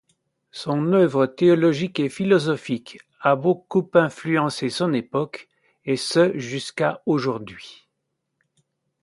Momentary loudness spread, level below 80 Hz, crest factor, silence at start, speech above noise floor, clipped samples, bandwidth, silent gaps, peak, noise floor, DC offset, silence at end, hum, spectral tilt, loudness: 14 LU; -66 dBFS; 20 dB; 0.55 s; 56 dB; under 0.1%; 11.5 kHz; none; -2 dBFS; -77 dBFS; under 0.1%; 1.3 s; none; -6 dB/octave; -22 LUFS